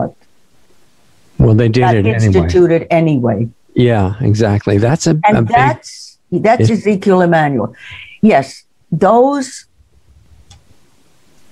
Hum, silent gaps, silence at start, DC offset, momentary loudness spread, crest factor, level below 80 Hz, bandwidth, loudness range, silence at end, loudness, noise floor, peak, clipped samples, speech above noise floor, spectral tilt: none; none; 0 s; under 0.1%; 14 LU; 12 dB; -38 dBFS; 11 kHz; 4 LU; 1.9 s; -12 LUFS; -54 dBFS; 0 dBFS; under 0.1%; 43 dB; -7 dB/octave